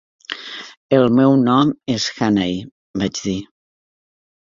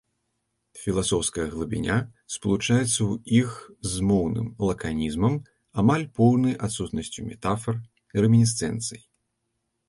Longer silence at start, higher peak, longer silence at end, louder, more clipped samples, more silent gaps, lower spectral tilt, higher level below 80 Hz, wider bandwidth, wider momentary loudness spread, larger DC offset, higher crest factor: second, 0.3 s vs 0.75 s; first, -2 dBFS vs -8 dBFS; first, 1.05 s vs 0.9 s; first, -17 LUFS vs -25 LUFS; neither; first, 0.77-0.89 s, 2.72-2.94 s vs none; about the same, -5.5 dB/octave vs -5.5 dB/octave; second, -52 dBFS vs -46 dBFS; second, 7.6 kHz vs 11.5 kHz; first, 17 LU vs 11 LU; neither; about the same, 18 dB vs 18 dB